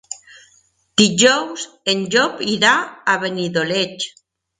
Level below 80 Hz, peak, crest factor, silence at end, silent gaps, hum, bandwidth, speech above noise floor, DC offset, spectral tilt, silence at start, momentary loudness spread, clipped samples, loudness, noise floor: -60 dBFS; 0 dBFS; 18 dB; 0.5 s; none; none; 9.8 kHz; 40 dB; under 0.1%; -2.5 dB/octave; 0.1 s; 14 LU; under 0.1%; -17 LUFS; -57 dBFS